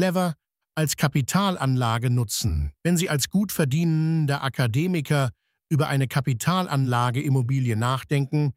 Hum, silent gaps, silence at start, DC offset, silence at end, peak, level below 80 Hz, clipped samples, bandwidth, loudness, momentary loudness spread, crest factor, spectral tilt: none; none; 0 s; under 0.1%; 0.05 s; -6 dBFS; -42 dBFS; under 0.1%; 16 kHz; -24 LUFS; 4 LU; 16 dB; -5.5 dB/octave